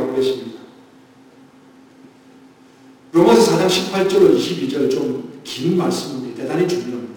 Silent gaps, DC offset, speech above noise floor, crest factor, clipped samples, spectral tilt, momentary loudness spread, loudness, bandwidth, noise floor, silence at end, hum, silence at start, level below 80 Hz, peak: none; under 0.1%; 29 dB; 18 dB; under 0.1%; -5 dB/octave; 15 LU; -17 LUFS; 19 kHz; -47 dBFS; 0 s; none; 0 s; -56 dBFS; -2 dBFS